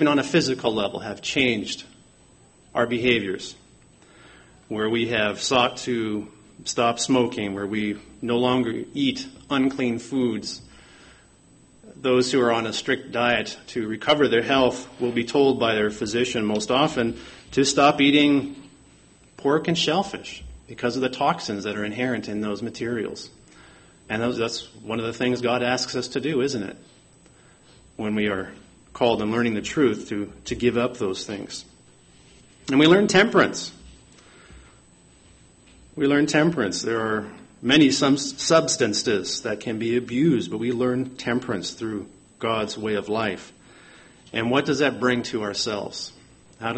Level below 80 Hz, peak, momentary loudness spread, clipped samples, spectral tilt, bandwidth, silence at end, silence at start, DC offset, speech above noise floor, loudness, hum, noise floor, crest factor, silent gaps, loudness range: -56 dBFS; -4 dBFS; 13 LU; under 0.1%; -4 dB/octave; 8.8 kHz; 0 s; 0 s; under 0.1%; 31 dB; -23 LUFS; none; -54 dBFS; 20 dB; none; 6 LU